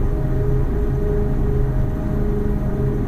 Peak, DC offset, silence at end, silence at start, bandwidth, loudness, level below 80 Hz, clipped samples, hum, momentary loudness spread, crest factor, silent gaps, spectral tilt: -8 dBFS; under 0.1%; 0 s; 0 s; 6.2 kHz; -22 LUFS; -22 dBFS; under 0.1%; none; 2 LU; 12 dB; none; -10 dB/octave